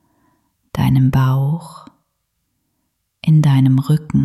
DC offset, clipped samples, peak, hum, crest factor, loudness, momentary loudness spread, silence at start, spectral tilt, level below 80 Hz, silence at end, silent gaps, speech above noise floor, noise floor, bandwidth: under 0.1%; under 0.1%; -4 dBFS; none; 12 dB; -15 LUFS; 13 LU; 0.75 s; -8.5 dB/octave; -42 dBFS; 0 s; none; 56 dB; -70 dBFS; 13.5 kHz